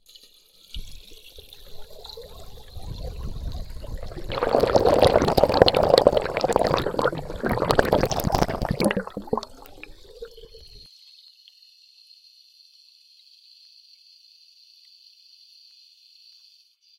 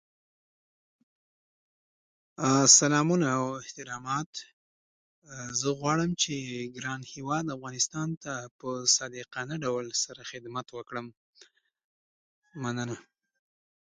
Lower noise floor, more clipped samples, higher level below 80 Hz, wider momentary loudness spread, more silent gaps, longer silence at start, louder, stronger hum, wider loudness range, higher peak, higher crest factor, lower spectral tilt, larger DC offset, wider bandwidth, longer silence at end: about the same, -58 dBFS vs -61 dBFS; neither; first, -38 dBFS vs -70 dBFS; first, 27 LU vs 16 LU; second, none vs 4.26-4.33 s, 4.53-5.22 s, 8.17-8.21 s, 8.51-8.59 s, 11.17-11.33 s, 11.84-12.42 s; second, 0.75 s vs 2.4 s; first, -22 LUFS vs -28 LUFS; neither; first, 20 LU vs 12 LU; first, 0 dBFS vs -4 dBFS; about the same, 26 dB vs 26 dB; first, -5 dB/octave vs -3 dB/octave; neither; first, 17 kHz vs 11 kHz; first, 6.2 s vs 0.95 s